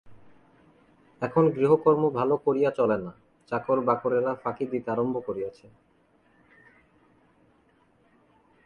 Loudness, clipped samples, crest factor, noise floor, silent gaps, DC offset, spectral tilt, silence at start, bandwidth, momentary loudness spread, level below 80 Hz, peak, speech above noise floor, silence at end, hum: -26 LUFS; under 0.1%; 20 dB; -64 dBFS; none; under 0.1%; -9.5 dB/octave; 0.05 s; 6.6 kHz; 12 LU; -66 dBFS; -8 dBFS; 39 dB; 3.15 s; none